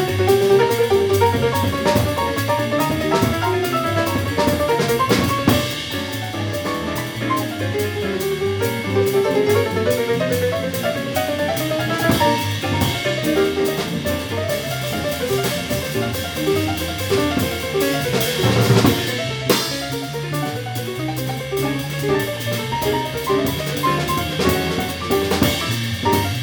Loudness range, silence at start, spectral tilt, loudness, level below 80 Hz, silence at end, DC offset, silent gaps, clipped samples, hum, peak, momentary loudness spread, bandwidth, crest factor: 4 LU; 0 s; -5 dB/octave; -19 LUFS; -42 dBFS; 0 s; under 0.1%; none; under 0.1%; none; -4 dBFS; 7 LU; over 20 kHz; 16 dB